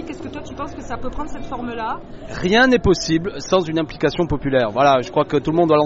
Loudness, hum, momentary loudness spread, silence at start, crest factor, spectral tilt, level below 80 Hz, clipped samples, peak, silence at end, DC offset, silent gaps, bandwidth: -19 LUFS; none; 16 LU; 0 s; 16 dB; -4 dB/octave; -38 dBFS; under 0.1%; -4 dBFS; 0 s; under 0.1%; none; 8 kHz